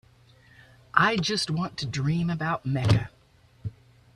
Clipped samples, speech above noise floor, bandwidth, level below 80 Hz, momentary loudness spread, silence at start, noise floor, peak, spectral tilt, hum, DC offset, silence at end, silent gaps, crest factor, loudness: under 0.1%; 33 dB; 12.5 kHz; -52 dBFS; 18 LU; 0.95 s; -59 dBFS; -2 dBFS; -5.5 dB/octave; none; under 0.1%; 0.45 s; none; 26 dB; -26 LUFS